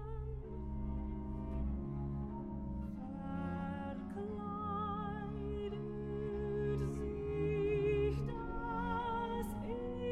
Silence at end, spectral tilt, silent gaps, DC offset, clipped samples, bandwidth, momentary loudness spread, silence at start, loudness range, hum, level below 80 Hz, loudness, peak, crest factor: 0 s; -8.5 dB/octave; none; under 0.1%; under 0.1%; 13 kHz; 8 LU; 0 s; 5 LU; none; -46 dBFS; -40 LUFS; -24 dBFS; 16 dB